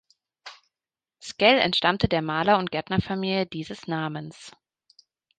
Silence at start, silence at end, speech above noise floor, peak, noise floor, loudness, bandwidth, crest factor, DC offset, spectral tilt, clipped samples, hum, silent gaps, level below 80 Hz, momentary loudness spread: 0.45 s; 0.9 s; over 66 dB; -4 dBFS; under -90 dBFS; -24 LUFS; 9.4 kHz; 22 dB; under 0.1%; -5.5 dB/octave; under 0.1%; none; none; -50 dBFS; 24 LU